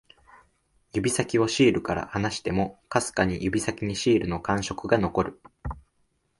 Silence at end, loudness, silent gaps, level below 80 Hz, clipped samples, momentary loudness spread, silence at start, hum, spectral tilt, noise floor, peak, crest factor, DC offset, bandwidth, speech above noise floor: 0.6 s; -26 LUFS; none; -46 dBFS; under 0.1%; 11 LU; 0.95 s; none; -5 dB/octave; -71 dBFS; -6 dBFS; 22 dB; under 0.1%; 11.5 kHz; 45 dB